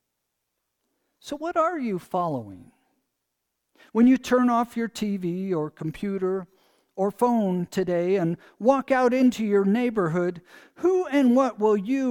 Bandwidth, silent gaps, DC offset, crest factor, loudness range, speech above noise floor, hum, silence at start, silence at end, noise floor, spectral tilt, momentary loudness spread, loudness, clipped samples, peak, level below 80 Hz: 16 kHz; none; under 0.1%; 18 dB; 8 LU; 57 dB; none; 1.25 s; 0 s; -80 dBFS; -7 dB/octave; 10 LU; -24 LUFS; under 0.1%; -6 dBFS; -62 dBFS